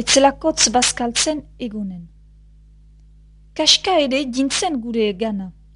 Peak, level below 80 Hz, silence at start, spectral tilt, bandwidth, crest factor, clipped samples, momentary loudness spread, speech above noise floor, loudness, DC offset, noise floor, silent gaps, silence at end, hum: 0 dBFS; -44 dBFS; 0 s; -2 dB/octave; 11 kHz; 20 dB; under 0.1%; 15 LU; 28 dB; -17 LUFS; under 0.1%; -47 dBFS; none; 0.25 s; 50 Hz at -70 dBFS